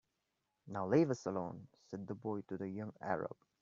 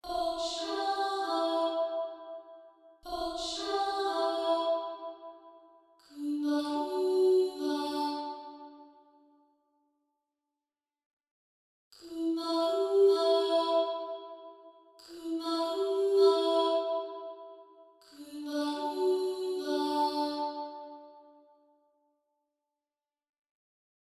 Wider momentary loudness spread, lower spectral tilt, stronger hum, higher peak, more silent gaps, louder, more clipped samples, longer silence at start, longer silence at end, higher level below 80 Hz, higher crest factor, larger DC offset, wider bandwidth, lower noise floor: second, 15 LU vs 21 LU; first, -7.5 dB/octave vs -2.5 dB/octave; neither; second, -18 dBFS vs -14 dBFS; second, none vs 11.06-11.20 s, 11.31-11.91 s; second, -40 LUFS vs -31 LUFS; neither; first, 0.65 s vs 0.05 s; second, 0.3 s vs 2.85 s; second, -78 dBFS vs -70 dBFS; about the same, 22 dB vs 18 dB; neither; second, 7.6 kHz vs 13 kHz; second, -86 dBFS vs under -90 dBFS